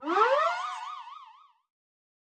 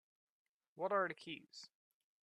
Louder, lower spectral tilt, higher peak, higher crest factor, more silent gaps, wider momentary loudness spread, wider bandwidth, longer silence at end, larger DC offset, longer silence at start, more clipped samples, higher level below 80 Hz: first, -27 LUFS vs -42 LUFS; second, -1.5 dB/octave vs -4.5 dB/octave; first, -10 dBFS vs -24 dBFS; about the same, 20 dB vs 22 dB; neither; first, 22 LU vs 19 LU; about the same, 9.6 kHz vs 10.5 kHz; first, 1 s vs 0.6 s; neither; second, 0 s vs 0.75 s; neither; about the same, under -90 dBFS vs under -90 dBFS